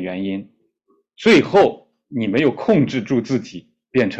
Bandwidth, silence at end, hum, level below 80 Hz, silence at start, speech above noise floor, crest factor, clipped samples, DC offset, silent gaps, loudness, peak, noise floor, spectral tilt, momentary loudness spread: 8.4 kHz; 0 s; none; -56 dBFS; 0 s; 47 dB; 16 dB; under 0.1%; under 0.1%; none; -18 LUFS; -2 dBFS; -64 dBFS; -6.5 dB/octave; 16 LU